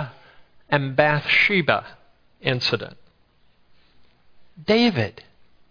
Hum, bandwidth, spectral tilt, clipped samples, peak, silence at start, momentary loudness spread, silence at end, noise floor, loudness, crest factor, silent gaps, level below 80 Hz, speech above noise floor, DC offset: none; 5.4 kHz; -6 dB/octave; under 0.1%; 0 dBFS; 0 s; 13 LU; 0.6 s; -58 dBFS; -20 LUFS; 24 dB; none; -58 dBFS; 38 dB; under 0.1%